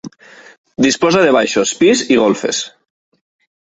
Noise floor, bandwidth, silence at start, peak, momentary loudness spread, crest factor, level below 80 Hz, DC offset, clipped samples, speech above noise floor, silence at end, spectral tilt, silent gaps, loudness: -42 dBFS; 8.4 kHz; 0.05 s; 0 dBFS; 15 LU; 16 dB; -54 dBFS; under 0.1%; under 0.1%; 29 dB; 0.95 s; -3.5 dB/octave; 0.58-0.64 s; -13 LUFS